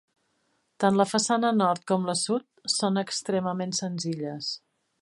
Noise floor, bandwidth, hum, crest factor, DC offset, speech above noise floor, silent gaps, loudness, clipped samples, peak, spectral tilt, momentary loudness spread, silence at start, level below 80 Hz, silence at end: -72 dBFS; 11.5 kHz; none; 20 dB; under 0.1%; 46 dB; none; -26 LUFS; under 0.1%; -8 dBFS; -4 dB/octave; 8 LU; 0.8 s; -74 dBFS; 0.45 s